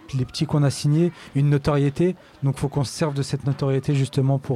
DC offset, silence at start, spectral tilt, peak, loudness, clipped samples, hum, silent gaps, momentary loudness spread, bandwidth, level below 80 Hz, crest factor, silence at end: under 0.1%; 0.1 s; -7 dB/octave; -10 dBFS; -23 LUFS; under 0.1%; none; none; 5 LU; 12 kHz; -48 dBFS; 12 dB; 0 s